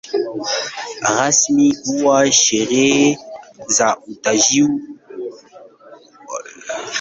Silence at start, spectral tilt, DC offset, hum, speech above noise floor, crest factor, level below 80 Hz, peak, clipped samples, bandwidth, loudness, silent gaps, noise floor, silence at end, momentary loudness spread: 0.05 s; -2 dB/octave; under 0.1%; none; 28 dB; 16 dB; -60 dBFS; 0 dBFS; under 0.1%; 8.4 kHz; -15 LUFS; none; -44 dBFS; 0 s; 18 LU